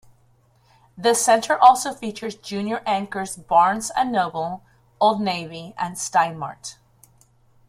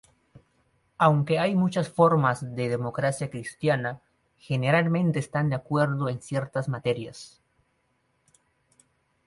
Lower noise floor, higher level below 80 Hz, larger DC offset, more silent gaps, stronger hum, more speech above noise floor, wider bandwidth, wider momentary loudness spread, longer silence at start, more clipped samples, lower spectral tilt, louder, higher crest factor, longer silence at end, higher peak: second, -59 dBFS vs -71 dBFS; about the same, -62 dBFS vs -64 dBFS; neither; neither; neither; second, 38 dB vs 46 dB; first, 16 kHz vs 11.5 kHz; first, 17 LU vs 11 LU; about the same, 0.95 s vs 1 s; neither; second, -3 dB/octave vs -7 dB/octave; first, -21 LUFS vs -26 LUFS; about the same, 22 dB vs 20 dB; second, 0.95 s vs 2 s; first, -2 dBFS vs -8 dBFS